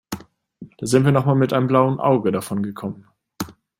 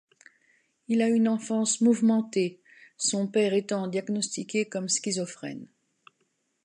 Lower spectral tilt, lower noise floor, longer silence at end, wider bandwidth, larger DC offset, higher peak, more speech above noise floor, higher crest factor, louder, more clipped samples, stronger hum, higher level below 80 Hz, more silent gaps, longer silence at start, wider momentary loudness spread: first, -7 dB/octave vs -4 dB/octave; second, -44 dBFS vs -74 dBFS; second, 0.3 s vs 1 s; first, 16.5 kHz vs 11 kHz; neither; first, -2 dBFS vs -12 dBFS; second, 25 dB vs 48 dB; about the same, 18 dB vs 16 dB; first, -19 LUFS vs -26 LUFS; neither; neither; first, -56 dBFS vs -80 dBFS; neither; second, 0.1 s vs 0.9 s; first, 16 LU vs 9 LU